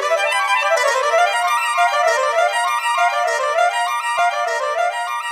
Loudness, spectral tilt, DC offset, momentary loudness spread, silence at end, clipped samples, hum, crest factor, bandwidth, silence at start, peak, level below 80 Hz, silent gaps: -17 LUFS; 3.5 dB/octave; under 0.1%; 4 LU; 0 s; under 0.1%; none; 14 dB; 16 kHz; 0 s; -4 dBFS; -82 dBFS; none